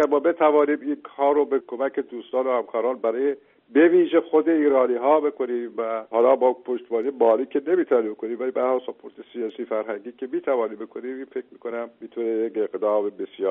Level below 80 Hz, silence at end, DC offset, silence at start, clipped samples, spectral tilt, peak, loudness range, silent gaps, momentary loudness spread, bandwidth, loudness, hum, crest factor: -74 dBFS; 0 s; under 0.1%; 0 s; under 0.1%; -3.5 dB/octave; -6 dBFS; 8 LU; none; 14 LU; 3.8 kHz; -23 LUFS; none; 18 dB